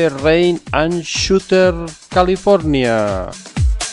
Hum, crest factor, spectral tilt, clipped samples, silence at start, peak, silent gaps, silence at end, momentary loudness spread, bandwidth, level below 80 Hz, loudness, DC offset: none; 14 dB; -5 dB/octave; under 0.1%; 0 s; 0 dBFS; none; 0 s; 7 LU; 11.5 kHz; -26 dBFS; -15 LUFS; under 0.1%